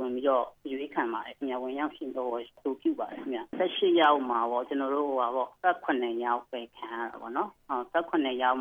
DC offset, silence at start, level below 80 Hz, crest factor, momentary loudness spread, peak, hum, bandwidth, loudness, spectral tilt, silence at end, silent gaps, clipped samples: under 0.1%; 0 s; -72 dBFS; 18 dB; 11 LU; -10 dBFS; none; 3.8 kHz; -30 LUFS; -6 dB/octave; 0 s; none; under 0.1%